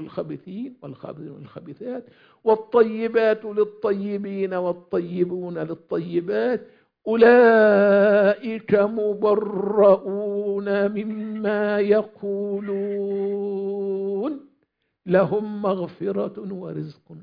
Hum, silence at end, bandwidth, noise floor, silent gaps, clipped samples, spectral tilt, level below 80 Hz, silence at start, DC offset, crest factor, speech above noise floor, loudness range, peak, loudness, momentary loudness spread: none; 0 s; 5.2 kHz; -71 dBFS; none; under 0.1%; -9.5 dB/octave; -68 dBFS; 0 s; under 0.1%; 18 dB; 50 dB; 8 LU; -4 dBFS; -21 LUFS; 18 LU